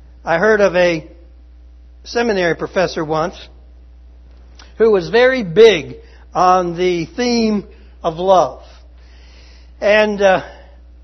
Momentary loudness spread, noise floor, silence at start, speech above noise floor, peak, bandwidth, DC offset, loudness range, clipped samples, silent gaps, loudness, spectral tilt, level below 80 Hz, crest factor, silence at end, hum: 12 LU; -41 dBFS; 0.25 s; 26 dB; 0 dBFS; 6.4 kHz; under 0.1%; 7 LU; under 0.1%; none; -15 LUFS; -5 dB/octave; -40 dBFS; 16 dB; 0.5 s; none